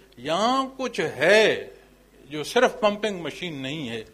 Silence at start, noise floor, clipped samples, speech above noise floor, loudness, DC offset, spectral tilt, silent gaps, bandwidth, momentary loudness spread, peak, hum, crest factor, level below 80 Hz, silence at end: 0.2 s; -53 dBFS; under 0.1%; 29 dB; -23 LUFS; under 0.1%; -3.5 dB/octave; none; 15.5 kHz; 14 LU; -6 dBFS; none; 20 dB; -60 dBFS; 0.1 s